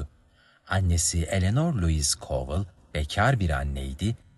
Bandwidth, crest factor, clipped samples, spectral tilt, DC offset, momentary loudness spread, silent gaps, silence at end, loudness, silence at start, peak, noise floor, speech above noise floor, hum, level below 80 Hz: 12.5 kHz; 18 dB; under 0.1%; -4.5 dB/octave; under 0.1%; 9 LU; none; 0.2 s; -26 LUFS; 0 s; -8 dBFS; -60 dBFS; 35 dB; none; -36 dBFS